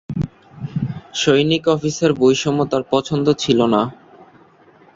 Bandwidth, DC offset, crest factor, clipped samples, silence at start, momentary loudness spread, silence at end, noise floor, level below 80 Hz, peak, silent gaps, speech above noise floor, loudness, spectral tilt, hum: 7.8 kHz; under 0.1%; 16 dB; under 0.1%; 0.1 s; 11 LU; 1 s; -49 dBFS; -48 dBFS; -2 dBFS; none; 33 dB; -18 LUFS; -5.5 dB/octave; none